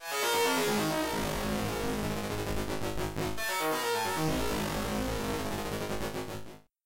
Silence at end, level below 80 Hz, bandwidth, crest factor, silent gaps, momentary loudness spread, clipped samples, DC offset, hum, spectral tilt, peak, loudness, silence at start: 0.25 s; -46 dBFS; 16 kHz; 14 dB; none; 7 LU; under 0.1%; under 0.1%; none; -4 dB/octave; -18 dBFS; -32 LUFS; 0 s